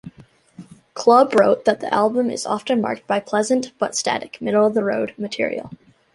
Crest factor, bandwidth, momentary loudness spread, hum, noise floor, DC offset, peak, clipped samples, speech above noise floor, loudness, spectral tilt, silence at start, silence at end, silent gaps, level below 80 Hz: 18 dB; 11.5 kHz; 10 LU; none; -48 dBFS; under 0.1%; -2 dBFS; under 0.1%; 29 dB; -19 LUFS; -4 dB/octave; 0.05 s; 0.4 s; none; -64 dBFS